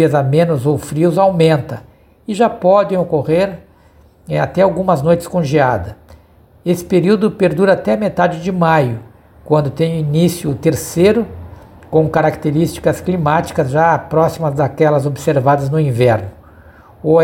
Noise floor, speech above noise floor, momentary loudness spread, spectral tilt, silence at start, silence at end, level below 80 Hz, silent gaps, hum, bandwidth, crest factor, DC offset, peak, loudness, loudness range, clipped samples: -47 dBFS; 33 dB; 8 LU; -7 dB/octave; 0 s; 0 s; -44 dBFS; none; none; 17 kHz; 14 dB; under 0.1%; 0 dBFS; -14 LUFS; 2 LU; under 0.1%